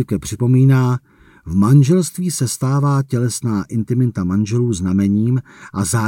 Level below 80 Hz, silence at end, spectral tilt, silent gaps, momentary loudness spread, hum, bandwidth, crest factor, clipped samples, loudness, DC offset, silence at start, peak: -46 dBFS; 0 s; -6.5 dB/octave; none; 9 LU; none; 16.5 kHz; 14 dB; under 0.1%; -17 LUFS; under 0.1%; 0 s; -2 dBFS